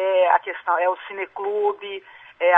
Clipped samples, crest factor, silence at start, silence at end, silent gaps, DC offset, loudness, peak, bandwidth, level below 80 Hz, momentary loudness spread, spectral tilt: under 0.1%; 20 dB; 0 s; 0 s; none; under 0.1%; -22 LUFS; 0 dBFS; 3.8 kHz; -74 dBFS; 14 LU; -4.5 dB/octave